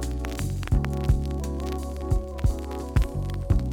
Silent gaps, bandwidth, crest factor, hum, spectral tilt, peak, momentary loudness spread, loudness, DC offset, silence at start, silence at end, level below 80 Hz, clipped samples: none; 17.5 kHz; 18 dB; none; -7 dB/octave; -6 dBFS; 6 LU; -28 LUFS; under 0.1%; 0 s; 0 s; -28 dBFS; under 0.1%